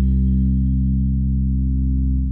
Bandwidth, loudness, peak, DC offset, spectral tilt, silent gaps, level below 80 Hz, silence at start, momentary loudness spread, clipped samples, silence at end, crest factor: 0.5 kHz; -20 LUFS; -10 dBFS; under 0.1%; -15 dB/octave; none; -20 dBFS; 0 s; 2 LU; under 0.1%; 0 s; 8 dB